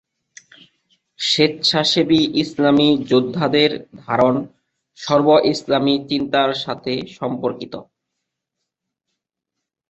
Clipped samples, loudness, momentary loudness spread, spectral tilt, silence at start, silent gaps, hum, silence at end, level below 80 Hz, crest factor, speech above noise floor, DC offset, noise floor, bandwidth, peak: under 0.1%; -17 LUFS; 11 LU; -5 dB/octave; 1.2 s; none; none; 2.1 s; -58 dBFS; 18 dB; 64 dB; under 0.1%; -82 dBFS; 8.2 kHz; -2 dBFS